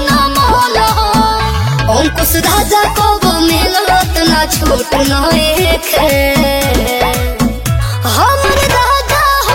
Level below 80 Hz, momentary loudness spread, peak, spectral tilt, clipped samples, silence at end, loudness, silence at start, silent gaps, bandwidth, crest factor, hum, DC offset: -20 dBFS; 4 LU; 0 dBFS; -4 dB/octave; under 0.1%; 0 s; -10 LUFS; 0 s; none; 17 kHz; 10 dB; none; under 0.1%